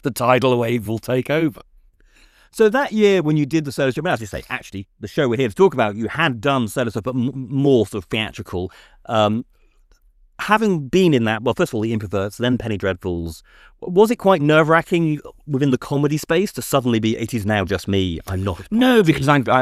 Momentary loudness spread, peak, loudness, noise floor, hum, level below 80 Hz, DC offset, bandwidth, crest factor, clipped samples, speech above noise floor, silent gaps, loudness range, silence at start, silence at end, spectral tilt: 12 LU; -2 dBFS; -19 LUFS; -54 dBFS; none; -48 dBFS; under 0.1%; 15.5 kHz; 18 dB; under 0.1%; 36 dB; none; 3 LU; 0.05 s; 0 s; -6 dB/octave